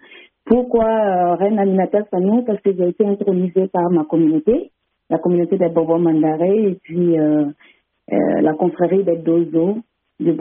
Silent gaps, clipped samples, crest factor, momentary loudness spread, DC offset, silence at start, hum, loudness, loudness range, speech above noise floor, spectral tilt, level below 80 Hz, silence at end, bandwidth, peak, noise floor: none; under 0.1%; 14 dB; 5 LU; under 0.1%; 0.1 s; none; -17 LUFS; 1 LU; 24 dB; -9 dB/octave; -52 dBFS; 0 s; 3.6 kHz; -2 dBFS; -40 dBFS